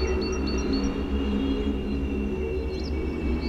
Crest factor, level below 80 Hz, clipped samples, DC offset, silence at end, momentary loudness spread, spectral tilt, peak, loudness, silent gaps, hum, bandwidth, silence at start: 12 dB; -32 dBFS; under 0.1%; under 0.1%; 0 s; 3 LU; -6.5 dB/octave; -14 dBFS; -28 LUFS; none; none; 7.4 kHz; 0 s